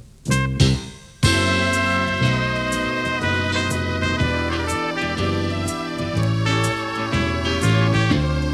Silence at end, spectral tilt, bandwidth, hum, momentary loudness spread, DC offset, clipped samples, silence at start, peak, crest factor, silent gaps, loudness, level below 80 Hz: 0 s; -5 dB/octave; 14.5 kHz; none; 5 LU; under 0.1%; under 0.1%; 0.05 s; -2 dBFS; 18 dB; none; -20 LUFS; -34 dBFS